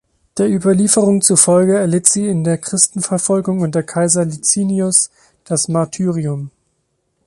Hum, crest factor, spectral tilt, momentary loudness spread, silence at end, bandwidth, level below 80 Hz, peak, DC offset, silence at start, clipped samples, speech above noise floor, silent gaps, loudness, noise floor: none; 16 dB; -4.5 dB/octave; 9 LU; 0.8 s; 12 kHz; -56 dBFS; 0 dBFS; under 0.1%; 0.35 s; under 0.1%; 52 dB; none; -14 LUFS; -67 dBFS